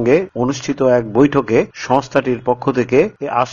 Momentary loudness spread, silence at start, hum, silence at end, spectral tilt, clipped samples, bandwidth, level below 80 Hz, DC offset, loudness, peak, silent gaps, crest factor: 5 LU; 0 s; none; 0 s; -6.5 dB/octave; under 0.1%; 7.4 kHz; -48 dBFS; under 0.1%; -16 LUFS; 0 dBFS; none; 16 dB